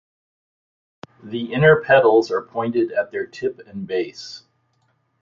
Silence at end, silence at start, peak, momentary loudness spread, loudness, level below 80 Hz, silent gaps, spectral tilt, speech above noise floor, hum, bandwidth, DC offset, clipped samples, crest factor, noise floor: 0.85 s; 1.25 s; -2 dBFS; 19 LU; -19 LUFS; -56 dBFS; none; -6.5 dB/octave; 47 dB; none; 7.4 kHz; under 0.1%; under 0.1%; 20 dB; -66 dBFS